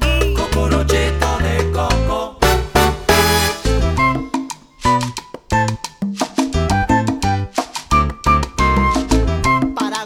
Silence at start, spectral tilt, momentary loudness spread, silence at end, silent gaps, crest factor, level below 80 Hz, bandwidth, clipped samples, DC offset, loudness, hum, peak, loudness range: 0 s; -5 dB/octave; 8 LU; 0 s; none; 16 dB; -22 dBFS; 19.5 kHz; under 0.1%; under 0.1%; -17 LUFS; none; 0 dBFS; 3 LU